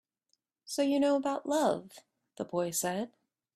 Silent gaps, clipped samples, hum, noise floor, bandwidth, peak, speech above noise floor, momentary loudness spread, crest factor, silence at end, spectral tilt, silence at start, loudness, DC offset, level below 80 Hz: none; under 0.1%; none; -79 dBFS; 15.5 kHz; -16 dBFS; 49 dB; 11 LU; 18 dB; 0.5 s; -4 dB/octave; 0.7 s; -31 LUFS; under 0.1%; -76 dBFS